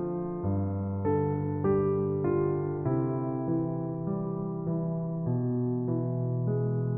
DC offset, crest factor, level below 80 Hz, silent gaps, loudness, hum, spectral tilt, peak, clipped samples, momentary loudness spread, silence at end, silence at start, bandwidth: under 0.1%; 14 dB; -58 dBFS; none; -30 LUFS; none; -13 dB/octave; -16 dBFS; under 0.1%; 5 LU; 0 s; 0 s; 2.6 kHz